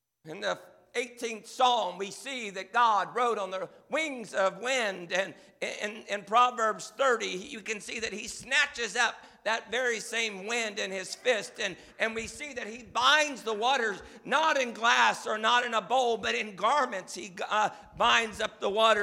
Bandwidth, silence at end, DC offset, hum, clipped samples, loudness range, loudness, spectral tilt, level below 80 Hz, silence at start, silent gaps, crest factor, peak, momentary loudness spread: 16 kHz; 0 s; under 0.1%; none; under 0.1%; 4 LU; -29 LUFS; -1.5 dB/octave; -68 dBFS; 0.25 s; none; 20 dB; -8 dBFS; 13 LU